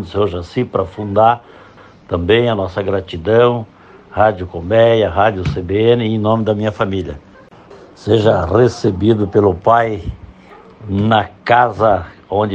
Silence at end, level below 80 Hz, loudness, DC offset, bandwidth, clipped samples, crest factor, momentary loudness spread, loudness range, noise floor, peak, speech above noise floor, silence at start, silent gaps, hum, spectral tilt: 0 s; -40 dBFS; -15 LUFS; under 0.1%; 8.2 kHz; under 0.1%; 14 dB; 11 LU; 2 LU; -40 dBFS; 0 dBFS; 26 dB; 0 s; none; none; -7.5 dB/octave